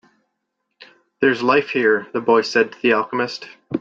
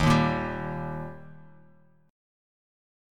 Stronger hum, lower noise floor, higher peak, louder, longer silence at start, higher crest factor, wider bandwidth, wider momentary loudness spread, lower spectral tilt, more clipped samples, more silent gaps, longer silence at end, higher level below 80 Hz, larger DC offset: neither; first, -76 dBFS vs -60 dBFS; first, -4 dBFS vs -8 dBFS; first, -18 LUFS vs -28 LUFS; first, 0.8 s vs 0 s; second, 16 dB vs 22 dB; second, 7.6 kHz vs 13.5 kHz; second, 9 LU vs 23 LU; second, -5 dB/octave vs -6.5 dB/octave; neither; neither; second, 0 s vs 1 s; second, -64 dBFS vs -46 dBFS; neither